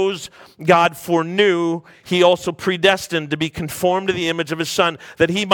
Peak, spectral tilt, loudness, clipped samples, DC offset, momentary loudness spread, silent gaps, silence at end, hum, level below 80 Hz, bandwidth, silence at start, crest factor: 0 dBFS; -4.5 dB/octave; -18 LUFS; under 0.1%; under 0.1%; 8 LU; none; 0 s; none; -54 dBFS; 18 kHz; 0 s; 18 dB